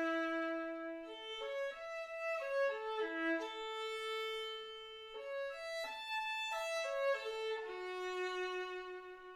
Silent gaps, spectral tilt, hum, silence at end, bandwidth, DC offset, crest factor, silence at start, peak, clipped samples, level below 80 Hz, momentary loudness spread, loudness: none; -1 dB/octave; none; 0 s; 16 kHz; under 0.1%; 14 dB; 0 s; -26 dBFS; under 0.1%; -76 dBFS; 9 LU; -41 LUFS